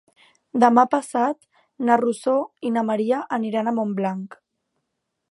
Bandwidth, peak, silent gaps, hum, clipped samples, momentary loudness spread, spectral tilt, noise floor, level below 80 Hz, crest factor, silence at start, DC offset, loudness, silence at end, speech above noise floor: 11.5 kHz; -2 dBFS; none; none; under 0.1%; 11 LU; -6 dB/octave; -78 dBFS; -76 dBFS; 22 dB; 0.55 s; under 0.1%; -21 LUFS; 1 s; 57 dB